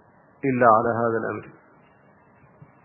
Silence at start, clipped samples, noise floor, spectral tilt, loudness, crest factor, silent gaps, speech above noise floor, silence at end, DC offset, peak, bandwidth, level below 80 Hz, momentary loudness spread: 0.45 s; under 0.1%; -56 dBFS; -13 dB/octave; -21 LUFS; 22 dB; none; 34 dB; 1.35 s; under 0.1%; -2 dBFS; 3 kHz; -62 dBFS; 14 LU